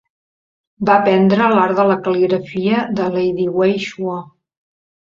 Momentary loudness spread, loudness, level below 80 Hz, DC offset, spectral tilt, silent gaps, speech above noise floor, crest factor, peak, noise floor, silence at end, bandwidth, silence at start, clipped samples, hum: 10 LU; -16 LUFS; -58 dBFS; under 0.1%; -7.5 dB/octave; none; over 75 dB; 16 dB; 0 dBFS; under -90 dBFS; 0.9 s; 7.4 kHz; 0.8 s; under 0.1%; none